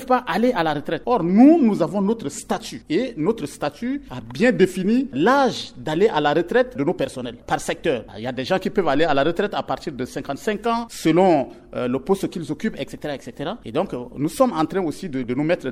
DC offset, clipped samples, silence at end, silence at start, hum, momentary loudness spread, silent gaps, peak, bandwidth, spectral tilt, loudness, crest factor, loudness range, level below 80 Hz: under 0.1%; under 0.1%; 0 s; 0 s; none; 11 LU; none; -2 dBFS; 15.5 kHz; -6 dB/octave; -21 LUFS; 18 dB; 5 LU; -50 dBFS